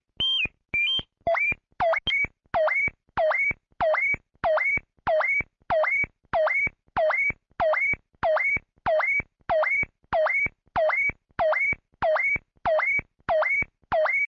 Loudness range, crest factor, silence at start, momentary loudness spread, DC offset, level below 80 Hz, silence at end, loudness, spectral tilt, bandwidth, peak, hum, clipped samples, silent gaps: 0 LU; 12 dB; 0.2 s; 5 LU; under 0.1%; -52 dBFS; 0 s; -24 LUFS; -4 dB/octave; 7 kHz; -14 dBFS; none; under 0.1%; none